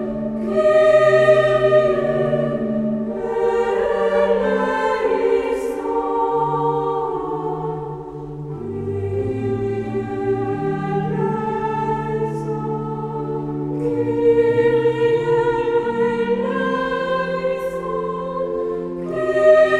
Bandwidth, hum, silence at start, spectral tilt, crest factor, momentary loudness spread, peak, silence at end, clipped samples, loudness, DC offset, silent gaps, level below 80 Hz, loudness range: 11 kHz; none; 0 s; -7.5 dB/octave; 16 dB; 10 LU; -2 dBFS; 0 s; under 0.1%; -19 LUFS; under 0.1%; none; -46 dBFS; 7 LU